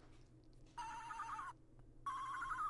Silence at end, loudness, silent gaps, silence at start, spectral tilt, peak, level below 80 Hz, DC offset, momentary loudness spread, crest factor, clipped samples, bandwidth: 0 s; -48 LUFS; none; 0 s; -3 dB/octave; -34 dBFS; -64 dBFS; under 0.1%; 21 LU; 14 dB; under 0.1%; 11.5 kHz